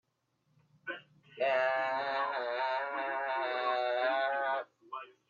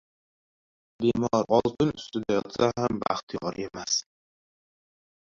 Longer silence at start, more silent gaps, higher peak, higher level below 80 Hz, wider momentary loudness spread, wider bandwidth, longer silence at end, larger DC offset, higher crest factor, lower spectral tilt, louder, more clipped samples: second, 0.85 s vs 1 s; second, none vs 3.23-3.27 s; second, -18 dBFS vs -8 dBFS; second, under -90 dBFS vs -58 dBFS; first, 15 LU vs 10 LU; about the same, 7 kHz vs 7.6 kHz; second, 0.2 s vs 1.3 s; neither; about the same, 18 dB vs 22 dB; about the same, -4 dB/octave vs -4.5 dB/octave; second, -33 LUFS vs -27 LUFS; neither